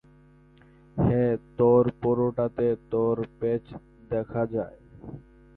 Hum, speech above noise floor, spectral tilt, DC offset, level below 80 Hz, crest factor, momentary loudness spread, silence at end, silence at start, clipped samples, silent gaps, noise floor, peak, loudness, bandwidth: none; 31 dB; -12.5 dB/octave; under 0.1%; -52 dBFS; 18 dB; 23 LU; 0.4 s; 0.95 s; under 0.1%; none; -55 dBFS; -10 dBFS; -26 LUFS; 4 kHz